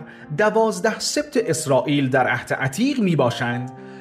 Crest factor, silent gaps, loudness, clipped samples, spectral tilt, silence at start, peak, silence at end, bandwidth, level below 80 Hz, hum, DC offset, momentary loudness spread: 16 dB; none; -20 LUFS; under 0.1%; -5 dB/octave; 0 s; -6 dBFS; 0 s; 15.5 kHz; -60 dBFS; none; under 0.1%; 6 LU